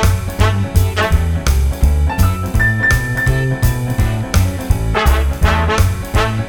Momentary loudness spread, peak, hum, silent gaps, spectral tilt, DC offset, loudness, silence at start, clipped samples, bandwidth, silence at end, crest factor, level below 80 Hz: 3 LU; 0 dBFS; none; none; -5.5 dB/octave; under 0.1%; -15 LUFS; 0 s; under 0.1%; 20 kHz; 0 s; 14 dB; -18 dBFS